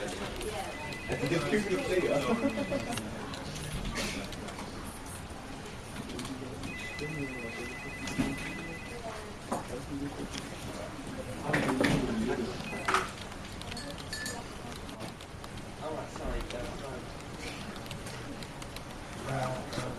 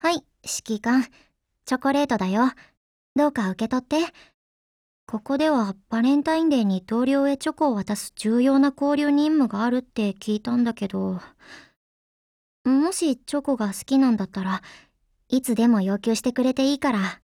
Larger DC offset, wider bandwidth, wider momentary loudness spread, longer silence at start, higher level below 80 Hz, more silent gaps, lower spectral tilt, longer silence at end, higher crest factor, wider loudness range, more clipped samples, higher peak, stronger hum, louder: neither; about the same, 14 kHz vs 14.5 kHz; first, 12 LU vs 9 LU; about the same, 0 s vs 0.05 s; first, -48 dBFS vs -62 dBFS; second, none vs 2.77-3.16 s, 4.34-5.07 s, 11.76-12.65 s; about the same, -4.5 dB/octave vs -5 dB/octave; about the same, 0 s vs 0.1 s; first, 24 dB vs 16 dB; first, 8 LU vs 5 LU; neither; second, -12 dBFS vs -8 dBFS; neither; second, -36 LUFS vs -23 LUFS